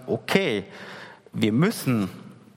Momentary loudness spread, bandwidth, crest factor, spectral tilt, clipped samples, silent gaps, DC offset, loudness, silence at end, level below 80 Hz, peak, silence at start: 18 LU; 16.5 kHz; 22 dB; -6 dB/octave; under 0.1%; none; under 0.1%; -24 LUFS; 0.25 s; -66 dBFS; -4 dBFS; 0 s